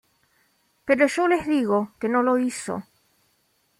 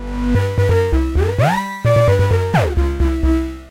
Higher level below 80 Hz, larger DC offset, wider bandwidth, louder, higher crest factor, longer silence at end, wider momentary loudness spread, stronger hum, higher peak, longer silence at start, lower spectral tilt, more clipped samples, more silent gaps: second, -62 dBFS vs -22 dBFS; neither; about the same, 15 kHz vs 16 kHz; second, -23 LUFS vs -16 LUFS; first, 20 dB vs 12 dB; first, 1 s vs 0 s; first, 13 LU vs 5 LU; neither; second, -6 dBFS vs -2 dBFS; first, 0.85 s vs 0 s; second, -5 dB/octave vs -7.5 dB/octave; neither; neither